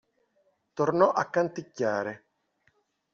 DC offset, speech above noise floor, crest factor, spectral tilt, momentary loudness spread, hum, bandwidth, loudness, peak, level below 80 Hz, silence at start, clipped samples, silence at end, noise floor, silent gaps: under 0.1%; 45 dB; 22 dB; -5.5 dB/octave; 15 LU; none; 7.2 kHz; -27 LUFS; -8 dBFS; -74 dBFS; 0.75 s; under 0.1%; 1 s; -71 dBFS; none